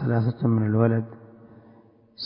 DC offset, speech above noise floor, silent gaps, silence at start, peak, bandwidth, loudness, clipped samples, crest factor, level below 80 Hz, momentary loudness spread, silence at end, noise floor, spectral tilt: under 0.1%; 32 dB; none; 0 s; -6 dBFS; 5.4 kHz; -23 LUFS; under 0.1%; 18 dB; -58 dBFS; 7 LU; 0 s; -54 dBFS; -12.5 dB/octave